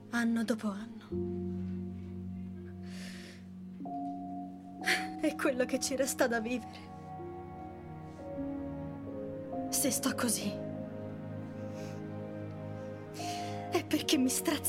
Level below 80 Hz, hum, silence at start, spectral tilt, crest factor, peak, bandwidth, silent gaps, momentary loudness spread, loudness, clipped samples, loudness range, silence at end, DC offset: -66 dBFS; none; 0 s; -4 dB/octave; 22 dB; -14 dBFS; 16 kHz; none; 15 LU; -36 LUFS; under 0.1%; 8 LU; 0 s; under 0.1%